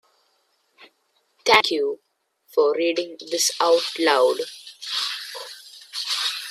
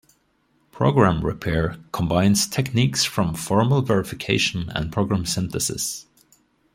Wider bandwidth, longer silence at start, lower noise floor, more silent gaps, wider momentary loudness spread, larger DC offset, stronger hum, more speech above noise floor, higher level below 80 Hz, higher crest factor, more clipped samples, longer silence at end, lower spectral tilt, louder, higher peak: about the same, 16 kHz vs 16.5 kHz; about the same, 0.8 s vs 0.75 s; about the same, -68 dBFS vs -65 dBFS; neither; first, 17 LU vs 8 LU; neither; neither; about the same, 47 dB vs 44 dB; second, -72 dBFS vs -44 dBFS; about the same, 24 dB vs 20 dB; neither; second, 0 s vs 0.75 s; second, -0.5 dB/octave vs -4.5 dB/octave; about the same, -21 LUFS vs -22 LUFS; about the same, 0 dBFS vs -2 dBFS